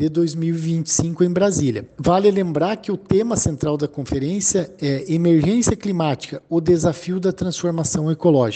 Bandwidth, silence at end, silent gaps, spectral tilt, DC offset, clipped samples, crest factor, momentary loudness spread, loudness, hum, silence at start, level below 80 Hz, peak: 9.2 kHz; 0 s; none; -5.5 dB/octave; under 0.1%; under 0.1%; 16 dB; 7 LU; -20 LUFS; none; 0 s; -44 dBFS; -2 dBFS